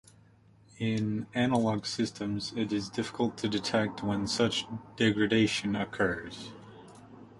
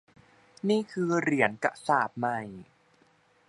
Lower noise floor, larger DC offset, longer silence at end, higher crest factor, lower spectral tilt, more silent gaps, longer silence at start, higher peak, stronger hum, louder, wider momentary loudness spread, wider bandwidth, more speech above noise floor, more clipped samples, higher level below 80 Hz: second, -60 dBFS vs -64 dBFS; neither; second, 0 s vs 0.85 s; about the same, 18 dB vs 22 dB; about the same, -5 dB/octave vs -6 dB/octave; neither; about the same, 0.75 s vs 0.65 s; second, -12 dBFS vs -8 dBFS; neither; about the same, -30 LUFS vs -28 LUFS; about the same, 11 LU vs 10 LU; about the same, 11.5 kHz vs 11.5 kHz; second, 30 dB vs 36 dB; neither; first, -60 dBFS vs -72 dBFS